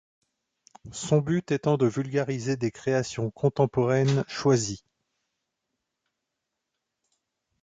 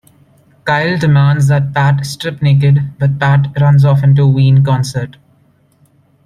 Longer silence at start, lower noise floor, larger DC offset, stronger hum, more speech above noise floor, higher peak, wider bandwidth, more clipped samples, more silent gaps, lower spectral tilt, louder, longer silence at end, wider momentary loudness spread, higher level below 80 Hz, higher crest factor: first, 0.85 s vs 0.65 s; first, -84 dBFS vs -52 dBFS; neither; neither; first, 58 dB vs 42 dB; second, -10 dBFS vs 0 dBFS; second, 9.4 kHz vs 11 kHz; neither; neither; about the same, -6 dB/octave vs -7 dB/octave; second, -26 LUFS vs -11 LUFS; first, 2.85 s vs 1.15 s; about the same, 8 LU vs 8 LU; second, -60 dBFS vs -46 dBFS; first, 20 dB vs 12 dB